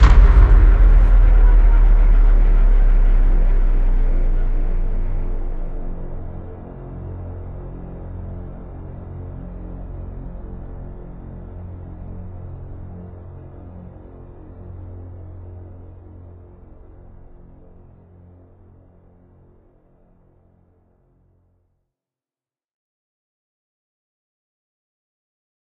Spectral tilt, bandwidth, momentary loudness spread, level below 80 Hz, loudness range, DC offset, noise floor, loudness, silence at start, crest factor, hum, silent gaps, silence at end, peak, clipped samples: -8.5 dB/octave; 3.6 kHz; 23 LU; -18 dBFS; 23 LU; under 0.1%; under -90 dBFS; -19 LUFS; 0 s; 18 dB; none; none; 10.1 s; 0 dBFS; under 0.1%